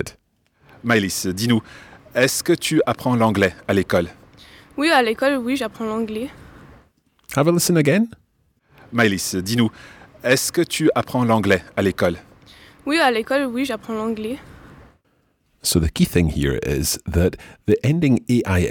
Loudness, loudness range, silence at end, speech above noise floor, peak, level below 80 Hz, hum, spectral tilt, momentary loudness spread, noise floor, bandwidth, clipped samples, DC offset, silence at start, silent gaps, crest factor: -20 LUFS; 3 LU; 0 s; 45 dB; -2 dBFS; -40 dBFS; none; -5 dB/octave; 10 LU; -64 dBFS; 19 kHz; under 0.1%; under 0.1%; 0 s; none; 18 dB